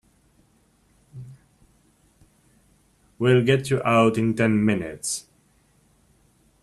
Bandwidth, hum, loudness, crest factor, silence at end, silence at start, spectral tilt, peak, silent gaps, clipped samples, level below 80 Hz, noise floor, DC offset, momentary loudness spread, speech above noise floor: 13 kHz; none; -21 LUFS; 20 dB; 1.45 s; 1.15 s; -5.5 dB/octave; -6 dBFS; none; under 0.1%; -58 dBFS; -62 dBFS; under 0.1%; 19 LU; 41 dB